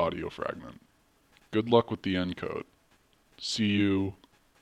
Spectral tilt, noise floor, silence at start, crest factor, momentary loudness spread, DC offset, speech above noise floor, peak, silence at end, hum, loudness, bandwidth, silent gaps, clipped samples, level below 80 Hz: -5.5 dB/octave; -66 dBFS; 0 s; 24 dB; 15 LU; under 0.1%; 36 dB; -8 dBFS; 0.45 s; none; -30 LUFS; 12 kHz; none; under 0.1%; -60 dBFS